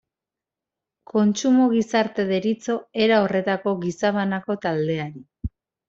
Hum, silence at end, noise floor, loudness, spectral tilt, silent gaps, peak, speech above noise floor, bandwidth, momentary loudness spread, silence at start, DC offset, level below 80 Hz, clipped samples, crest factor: none; 0.4 s; -88 dBFS; -22 LUFS; -5.5 dB/octave; none; -6 dBFS; 67 dB; 7.8 kHz; 13 LU; 1.15 s; under 0.1%; -48 dBFS; under 0.1%; 18 dB